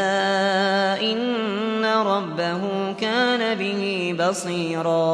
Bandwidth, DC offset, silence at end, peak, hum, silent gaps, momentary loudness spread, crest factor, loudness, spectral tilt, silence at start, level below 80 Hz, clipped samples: 11 kHz; under 0.1%; 0 s; -6 dBFS; none; none; 5 LU; 14 dB; -22 LUFS; -4.5 dB/octave; 0 s; -72 dBFS; under 0.1%